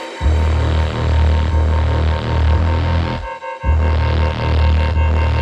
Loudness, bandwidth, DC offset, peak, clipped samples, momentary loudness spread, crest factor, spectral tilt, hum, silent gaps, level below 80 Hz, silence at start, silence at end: -17 LUFS; 8 kHz; under 0.1%; -4 dBFS; under 0.1%; 4 LU; 12 dB; -7.5 dB/octave; none; none; -18 dBFS; 0 s; 0 s